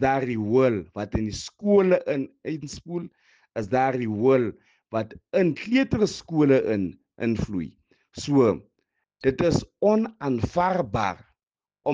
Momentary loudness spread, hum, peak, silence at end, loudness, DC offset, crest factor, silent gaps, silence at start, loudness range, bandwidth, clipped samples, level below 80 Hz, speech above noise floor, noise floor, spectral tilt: 13 LU; none; -6 dBFS; 0 s; -24 LUFS; under 0.1%; 18 dB; 11.43-11.47 s; 0 s; 2 LU; 9.4 kHz; under 0.1%; -48 dBFS; over 67 dB; under -90 dBFS; -6.5 dB/octave